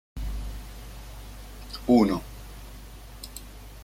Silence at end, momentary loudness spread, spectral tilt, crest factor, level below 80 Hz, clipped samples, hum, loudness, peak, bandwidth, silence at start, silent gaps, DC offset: 0 s; 24 LU; -6.5 dB/octave; 22 dB; -40 dBFS; under 0.1%; none; -26 LUFS; -8 dBFS; 16.5 kHz; 0.15 s; none; under 0.1%